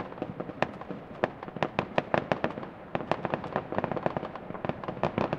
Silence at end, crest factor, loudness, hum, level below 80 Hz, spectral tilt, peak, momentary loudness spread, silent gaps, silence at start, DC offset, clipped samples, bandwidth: 0 s; 28 dB; -33 LUFS; none; -58 dBFS; -7.5 dB/octave; -4 dBFS; 8 LU; none; 0 s; under 0.1%; under 0.1%; 9.2 kHz